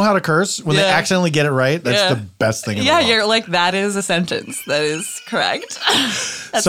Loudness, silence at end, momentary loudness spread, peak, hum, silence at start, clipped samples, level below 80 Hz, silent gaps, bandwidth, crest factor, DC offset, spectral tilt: -17 LUFS; 0 s; 7 LU; -2 dBFS; none; 0 s; under 0.1%; -56 dBFS; none; 17 kHz; 16 dB; under 0.1%; -3.5 dB/octave